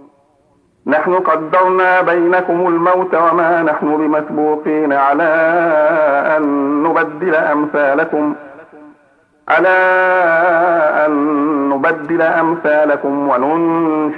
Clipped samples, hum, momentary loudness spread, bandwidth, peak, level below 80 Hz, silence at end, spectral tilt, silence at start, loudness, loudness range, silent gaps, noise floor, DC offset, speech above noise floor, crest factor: under 0.1%; none; 4 LU; 5.4 kHz; -2 dBFS; -64 dBFS; 0 s; -8 dB/octave; 0.85 s; -13 LUFS; 2 LU; none; -55 dBFS; under 0.1%; 42 dB; 12 dB